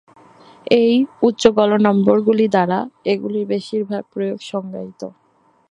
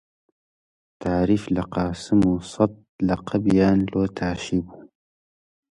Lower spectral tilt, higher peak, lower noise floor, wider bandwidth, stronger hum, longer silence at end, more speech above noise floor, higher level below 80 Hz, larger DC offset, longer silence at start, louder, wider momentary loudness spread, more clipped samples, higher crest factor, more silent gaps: about the same, -6.5 dB/octave vs -7.5 dB/octave; first, 0 dBFS vs -6 dBFS; second, -46 dBFS vs under -90 dBFS; about the same, 10 kHz vs 11 kHz; neither; second, 0.6 s vs 0.9 s; second, 29 dB vs over 69 dB; second, -58 dBFS vs -44 dBFS; neither; second, 0.65 s vs 1 s; first, -17 LUFS vs -23 LUFS; first, 16 LU vs 8 LU; neither; about the same, 18 dB vs 18 dB; second, none vs 2.89-2.99 s